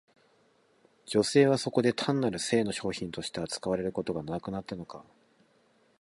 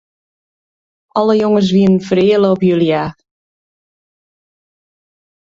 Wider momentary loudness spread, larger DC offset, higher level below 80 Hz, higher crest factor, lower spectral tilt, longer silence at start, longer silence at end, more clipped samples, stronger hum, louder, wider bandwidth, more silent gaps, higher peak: first, 14 LU vs 7 LU; neither; second, -62 dBFS vs -52 dBFS; about the same, 20 dB vs 16 dB; second, -5 dB/octave vs -7.5 dB/octave; about the same, 1.05 s vs 1.15 s; second, 1 s vs 2.35 s; neither; neither; second, -29 LUFS vs -13 LUFS; first, 11.5 kHz vs 7.6 kHz; neither; second, -10 dBFS vs 0 dBFS